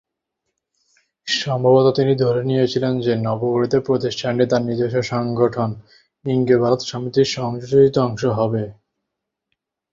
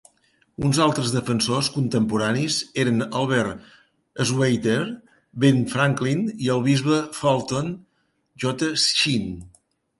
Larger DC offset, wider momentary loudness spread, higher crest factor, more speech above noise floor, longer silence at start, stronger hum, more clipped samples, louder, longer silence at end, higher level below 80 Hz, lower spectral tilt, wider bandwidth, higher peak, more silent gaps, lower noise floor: neither; second, 9 LU vs 12 LU; about the same, 16 dB vs 20 dB; first, 62 dB vs 42 dB; first, 1.25 s vs 0.6 s; neither; neither; first, -19 LUFS vs -22 LUFS; first, 1.2 s vs 0.55 s; about the same, -54 dBFS vs -54 dBFS; first, -6.5 dB/octave vs -5 dB/octave; second, 7.6 kHz vs 11.5 kHz; about the same, -2 dBFS vs -4 dBFS; neither; first, -80 dBFS vs -63 dBFS